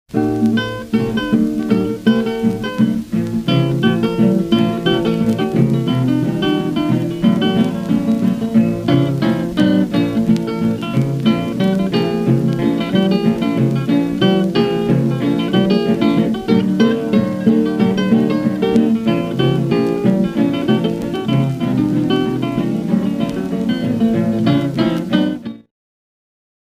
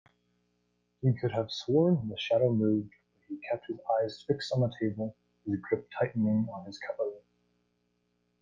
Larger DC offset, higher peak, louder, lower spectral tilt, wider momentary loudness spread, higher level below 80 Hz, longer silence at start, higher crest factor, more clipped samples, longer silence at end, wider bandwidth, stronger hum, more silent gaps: neither; first, 0 dBFS vs -14 dBFS; first, -16 LUFS vs -31 LUFS; about the same, -7.5 dB/octave vs -7.5 dB/octave; second, 4 LU vs 13 LU; first, -44 dBFS vs -68 dBFS; second, 0.1 s vs 1 s; about the same, 16 dB vs 18 dB; neither; about the same, 1.2 s vs 1.2 s; first, 15 kHz vs 7.6 kHz; second, none vs 60 Hz at -55 dBFS; neither